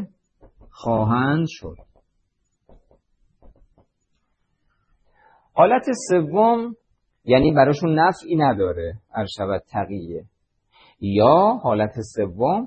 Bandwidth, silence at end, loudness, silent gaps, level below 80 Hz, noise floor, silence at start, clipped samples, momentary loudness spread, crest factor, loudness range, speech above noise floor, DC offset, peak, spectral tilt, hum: 8.8 kHz; 0 s; -20 LUFS; none; -50 dBFS; -71 dBFS; 0 s; under 0.1%; 15 LU; 20 dB; 8 LU; 52 dB; under 0.1%; -2 dBFS; -7 dB/octave; none